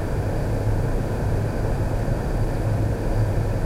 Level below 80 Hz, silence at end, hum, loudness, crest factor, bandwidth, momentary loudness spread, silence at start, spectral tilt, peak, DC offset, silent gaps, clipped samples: -26 dBFS; 0 s; none; -25 LUFS; 12 dB; 15 kHz; 2 LU; 0 s; -8 dB/octave; -10 dBFS; under 0.1%; none; under 0.1%